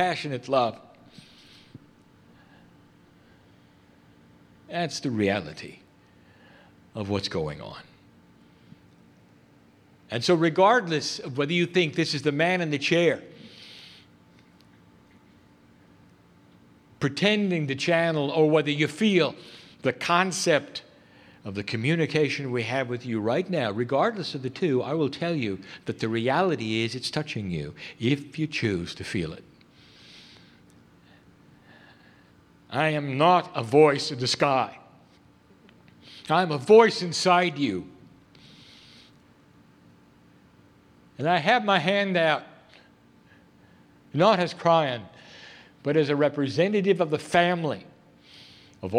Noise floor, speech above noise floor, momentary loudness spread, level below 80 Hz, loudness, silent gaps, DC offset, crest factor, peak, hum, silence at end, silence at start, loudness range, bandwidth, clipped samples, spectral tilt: -57 dBFS; 33 dB; 16 LU; -64 dBFS; -25 LUFS; none; under 0.1%; 24 dB; -4 dBFS; none; 0 s; 0 s; 11 LU; 13.5 kHz; under 0.1%; -5 dB/octave